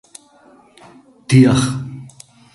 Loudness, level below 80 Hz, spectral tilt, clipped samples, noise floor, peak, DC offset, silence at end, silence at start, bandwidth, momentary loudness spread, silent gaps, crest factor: -14 LUFS; -46 dBFS; -6.5 dB/octave; under 0.1%; -49 dBFS; 0 dBFS; under 0.1%; 0.45 s; 1.3 s; 11.5 kHz; 21 LU; none; 18 dB